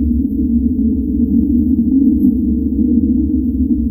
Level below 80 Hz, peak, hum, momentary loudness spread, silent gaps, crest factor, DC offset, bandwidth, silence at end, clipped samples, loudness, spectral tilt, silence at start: -24 dBFS; 0 dBFS; none; 4 LU; none; 12 dB; under 0.1%; 0.9 kHz; 0 s; under 0.1%; -14 LUFS; -17.5 dB/octave; 0 s